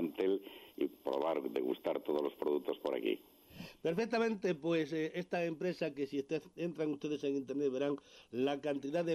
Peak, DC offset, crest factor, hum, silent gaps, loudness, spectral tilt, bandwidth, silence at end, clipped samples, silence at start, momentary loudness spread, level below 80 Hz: -24 dBFS; under 0.1%; 14 dB; none; none; -37 LUFS; -6.5 dB/octave; 14 kHz; 0 s; under 0.1%; 0 s; 6 LU; -76 dBFS